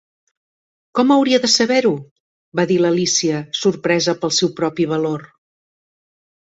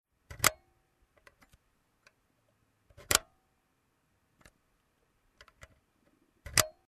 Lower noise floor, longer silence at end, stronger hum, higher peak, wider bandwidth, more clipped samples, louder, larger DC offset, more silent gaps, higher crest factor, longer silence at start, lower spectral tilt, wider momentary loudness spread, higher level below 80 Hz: first, under -90 dBFS vs -75 dBFS; first, 1.25 s vs 0.2 s; neither; about the same, -2 dBFS vs -4 dBFS; second, 8 kHz vs 13.5 kHz; neither; first, -17 LUFS vs -29 LUFS; neither; first, 2.11-2.52 s vs none; second, 16 dB vs 36 dB; first, 0.95 s vs 0.3 s; first, -3.5 dB/octave vs -1 dB/octave; second, 9 LU vs 20 LU; about the same, -62 dBFS vs -60 dBFS